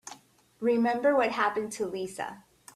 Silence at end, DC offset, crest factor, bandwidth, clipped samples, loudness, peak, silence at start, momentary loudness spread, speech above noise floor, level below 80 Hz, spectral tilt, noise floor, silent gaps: 0.35 s; under 0.1%; 18 dB; 14 kHz; under 0.1%; -28 LUFS; -12 dBFS; 0.05 s; 13 LU; 25 dB; -70 dBFS; -4.5 dB/octave; -53 dBFS; none